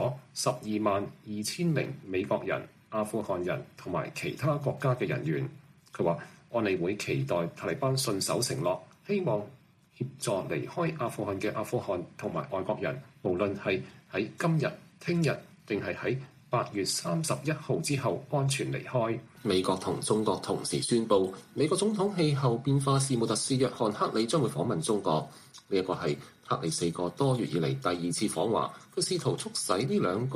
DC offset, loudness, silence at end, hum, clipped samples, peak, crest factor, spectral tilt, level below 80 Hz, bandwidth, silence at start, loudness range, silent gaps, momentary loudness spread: under 0.1%; -31 LUFS; 0 s; none; under 0.1%; -10 dBFS; 20 dB; -5 dB/octave; -66 dBFS; 15 kHz; 0 s; 5 LU; none; 7 LU